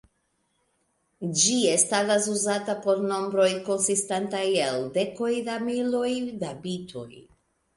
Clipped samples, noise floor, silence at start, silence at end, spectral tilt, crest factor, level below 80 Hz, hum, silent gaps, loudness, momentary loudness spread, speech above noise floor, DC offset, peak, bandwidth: under 0.1%; -73 dBFS; 1.2 s; 0.55 s; -3 dB/octave; 20 dB; -68 dBFS; none; none; -25 LUFS; 13 LU; 47 dB; under 0.1%; -6 dBFS; 11.5 kHz